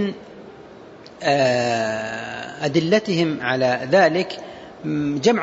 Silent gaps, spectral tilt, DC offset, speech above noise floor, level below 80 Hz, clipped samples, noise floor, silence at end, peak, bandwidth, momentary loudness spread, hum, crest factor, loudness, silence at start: none; -5.5 dB/octave; under 0.1%; 22 dB; -60 dBFS; under 0.1%; -42 dBFS; 0 s; -4 dBFS; 8 kHz; 19 LU; none; 16 dB; -20 LUFS; 0 s